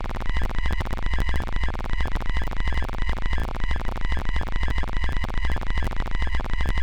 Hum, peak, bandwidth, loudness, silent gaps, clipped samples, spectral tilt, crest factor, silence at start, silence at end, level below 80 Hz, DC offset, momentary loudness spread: none; -14 dBFS; 8.4 kHz; -29 LUFS; none; under 0.1%; -6 dB/octave; 6 dB; 0 s; 0 s; -26 dBFS; 2%; 2 LU